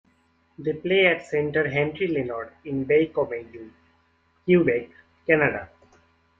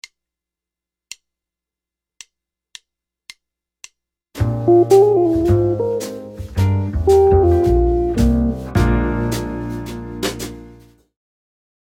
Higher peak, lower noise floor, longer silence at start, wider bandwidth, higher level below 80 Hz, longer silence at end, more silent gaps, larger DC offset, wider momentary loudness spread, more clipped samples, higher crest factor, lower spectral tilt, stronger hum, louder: second, -4 dBFS vs 0 dBFS; second, -65 dBFS vs -87 dBFS; second, 0.6 s vs 4.35 s; second, 7.6 kHz vs 17 kHz; second, -62 dBFS vs -28 dBFS; second, 0.75 s vs 1.2 s; neither; neither; second, 15 LU vs 19 LU; neither; about the same, 22 dB vs 18 dB; about the same, -7.5 dB/octave vs -7.5 dB/octave; neither; second, -23 LUFS vs -16 LUFS